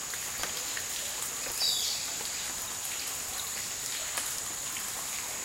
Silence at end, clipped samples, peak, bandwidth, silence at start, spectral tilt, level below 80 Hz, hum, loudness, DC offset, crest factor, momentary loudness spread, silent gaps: 0 s; under 0.1%; -12 dBFS; 17 kHz; 0 s; 1 dB/octave; -60 dBFS; none; -32 LUFS; under 0.1%; 22 dB; 5 LU; none